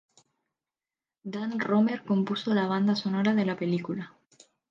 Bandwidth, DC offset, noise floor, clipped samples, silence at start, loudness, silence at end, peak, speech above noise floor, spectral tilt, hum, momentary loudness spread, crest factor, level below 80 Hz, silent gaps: 7.4 kHz; under 0.1%; under -90 dBFS; under 0.1%; 1.25 s; -28 LUFS; 0.6 s; -14 dBFS; over 63 dB; -7 dB/octave; none; 12 LU; 16 dB; -76 dBFS; none